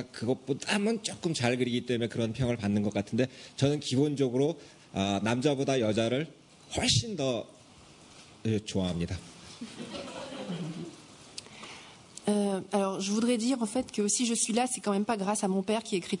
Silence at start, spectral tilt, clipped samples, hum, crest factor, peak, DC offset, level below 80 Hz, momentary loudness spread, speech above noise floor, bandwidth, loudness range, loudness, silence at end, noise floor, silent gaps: 0 s; -4.5 dB/octave; under 0.1%; none; 18 dB; -12 dBFS; under 0.1%; -62 dBFS; 15 LU; 25 dB; 11 kHz; 8 LU; -30 LUFS; 0 s; -54 dBFS; none